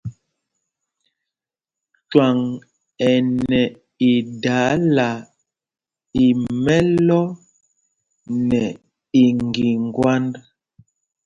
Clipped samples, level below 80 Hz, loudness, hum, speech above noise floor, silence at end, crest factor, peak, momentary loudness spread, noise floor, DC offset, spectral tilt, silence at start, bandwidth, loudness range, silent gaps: under 0.1%; -50 dBFS; -19 LUFS; none; 73 dB; 0.85 s; 20 dB; 0 dBFS; 11 LU; -90 dBFS; under 0.1%; -7 dB/octave; 0.05 s; 7.4 kHz; 2 LU; none